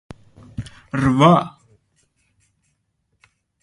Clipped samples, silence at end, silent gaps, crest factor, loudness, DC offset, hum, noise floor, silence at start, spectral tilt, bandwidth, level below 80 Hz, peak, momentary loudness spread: under 0.1%; 2.15 s; none; 20 dB; -16 LUFS; under 0.1%; none; -70 dBFS; 0.6 s; -7 dB/octave; 11 kHz; -48 dBFS; -2 dBFS; 21 LU